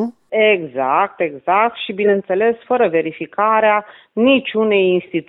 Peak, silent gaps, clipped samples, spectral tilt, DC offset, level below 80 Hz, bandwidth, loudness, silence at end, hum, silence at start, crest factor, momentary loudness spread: -2 dBFS; none; under 0.1%; -8.5 dB/octave; under 0.1%; -64 dBFS; 4.1 kHz; -16 LUFS; 0.05 s; none; 0 s; 14 dB; 6 LU